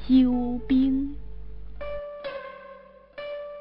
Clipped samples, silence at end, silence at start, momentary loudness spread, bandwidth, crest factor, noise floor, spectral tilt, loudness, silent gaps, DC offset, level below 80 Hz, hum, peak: under 0.1%; 0 s; 0 s; 23 LU; 5.2 kHz; 16 dB; -48 dBFS; -9.5 dB/octave; -26 LUFS; none; under 0.1%; -42 dBFS; none; -10 dBFS